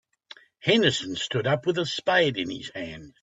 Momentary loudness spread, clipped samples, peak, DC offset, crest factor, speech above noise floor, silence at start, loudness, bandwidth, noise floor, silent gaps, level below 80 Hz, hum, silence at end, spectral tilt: 14 LU; under 0.1%; -4 dBFS; under 0.1%; 22 dB; 26 dB; 0.65 s; -25 LUFS; 8.4 kHz; -51 dBFS; none; -62 dBFS; none; 0.15 s; -4.5 dB/octave